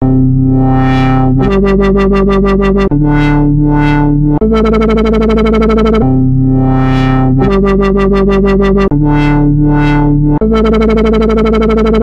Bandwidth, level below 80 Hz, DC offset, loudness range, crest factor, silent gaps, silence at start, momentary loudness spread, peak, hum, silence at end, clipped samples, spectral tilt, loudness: 7.8 kHz; -16 dBFS; under 0.1%; 0 LU; 8 dB; none; 0 s; 1 LU; 0 dBFS; none; 0 s; under 0.1%; -9 dB/octave; -9 LUFS